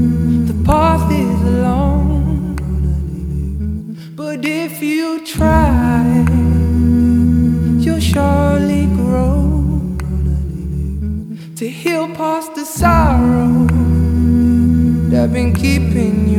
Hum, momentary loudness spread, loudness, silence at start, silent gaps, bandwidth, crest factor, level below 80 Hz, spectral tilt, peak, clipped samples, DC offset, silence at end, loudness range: none; 10 LU; -15 LUFS; 0 s; none; 16 kHz; 14 dB; -20 dBFS; -7.5 dB/octave; 0 dBFS; under 0.1%; under 0.1%; 0 s; 6 LU